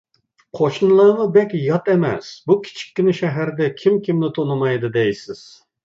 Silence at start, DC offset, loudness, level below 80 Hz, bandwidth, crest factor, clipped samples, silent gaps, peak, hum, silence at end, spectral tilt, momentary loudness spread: 0.55 s; under 0.1%; -18 LUFS; -62 dBFS; 7.6 kHz; 16 dB; under 0.1%; none; -2 dBFS; none; 0.5 s; -7.5 dB/octave; 14 LU